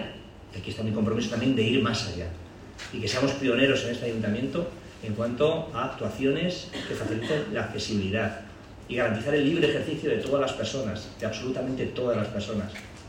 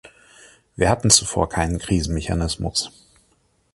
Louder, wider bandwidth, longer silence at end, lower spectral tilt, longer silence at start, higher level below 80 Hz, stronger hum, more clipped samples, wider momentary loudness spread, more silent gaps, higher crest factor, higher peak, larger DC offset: second, -28 LUFS vs -20 LUFS; about the same, 16 kHz vs 16 kHz; second, 0 s vs 0.85 s; first, -5.5 dB/octave vs -3.5 dB/octave; second, 0 s vs 0.8 s; second, -52 dBFS vs -34 dBFS; neither; neither; first, 14 LU vs 9 LU; neither; about the same, 18 dB vs 22 dB; second, -10 dBFS vs 0 dBFS; neither